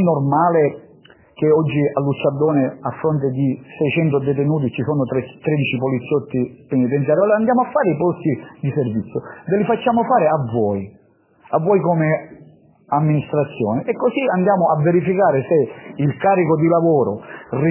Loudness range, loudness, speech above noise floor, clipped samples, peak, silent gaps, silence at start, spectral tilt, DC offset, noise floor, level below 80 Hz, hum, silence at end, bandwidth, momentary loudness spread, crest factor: 3 LU; -18 LUFS; 36 dB; under 0.1%; -2 dBFS; none; 0 s; -12 dB/octave; under 0.1%; -54 dBFS; -56 dBFS; none; 0 s; 3.2 kHz; 8 LU; 14 dB